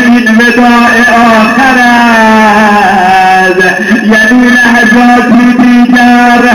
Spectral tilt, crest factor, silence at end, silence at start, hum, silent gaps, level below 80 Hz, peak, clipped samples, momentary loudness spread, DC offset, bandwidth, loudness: -4.5 dB/octave; 4 dB; 0 s; 0 s; none; none; -36 dBFS; 0 dBFS; 0.5%; 2 LU; 0.5%; 19 kHz; -3 LUFS